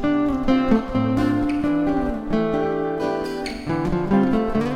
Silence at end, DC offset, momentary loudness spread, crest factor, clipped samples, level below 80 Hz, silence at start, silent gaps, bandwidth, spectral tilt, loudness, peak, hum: 0 s; under 0.1%; 6 LU; 16 dB; under 0.1%; -36 dBFS; 0 s; none; 11 kHz; -7.5 dB/octave; -22 LUFS; -6 dBFS; none